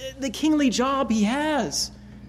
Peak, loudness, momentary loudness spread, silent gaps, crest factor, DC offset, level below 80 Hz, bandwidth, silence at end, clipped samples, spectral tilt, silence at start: -10 dBFS; -23 LUFS; 7 LU; none; 12 dB; under 0.1%; -48 dBFS; 15.5 kHz; 0 s; under 0.1%; -4 dB/octave; 0 s